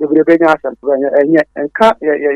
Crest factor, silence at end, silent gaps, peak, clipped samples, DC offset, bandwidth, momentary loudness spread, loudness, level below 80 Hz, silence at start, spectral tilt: 12 dB; 0 s; none; 0 dBFS; 0.3%; under 0.1%; 9.4 kHz; 6 LU; -12 LUFS; -52 dBFS; 0 s; -6.5 dB/octave